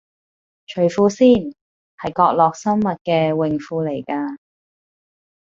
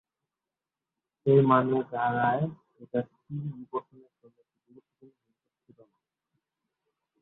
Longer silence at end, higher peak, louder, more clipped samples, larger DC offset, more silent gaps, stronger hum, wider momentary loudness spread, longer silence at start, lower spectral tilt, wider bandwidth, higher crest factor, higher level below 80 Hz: second, 1.2 s vs 3.4 s; first, -2 dBFS vs -8 dBFS; first, -18 LUFS vs -28 LUFS; neither; neither; first, 1.61-1.98 s, 3.01-3.05 s vs none; neither; about the same, 15 LU vs 16 LU; second, 0.7 s vs 1.25 s; second, -6.5 dB/octave vs -11.5 dB/octave; first, 7.6 kHz vs 4 kHz; second, 18 dB vs 24 dB; first, -56 dBFS vs -70 dBFS